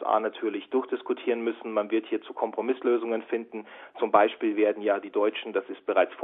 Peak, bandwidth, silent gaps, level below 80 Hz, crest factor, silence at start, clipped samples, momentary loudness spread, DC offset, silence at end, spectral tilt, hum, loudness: -6 dBFS; 4 kHz; none; -80 dBFS; 22 dB; 0 s; under 0.1%; 8 LU; under 0.1%; 0 s; -8.5 dB/octave; none; -28 LUFS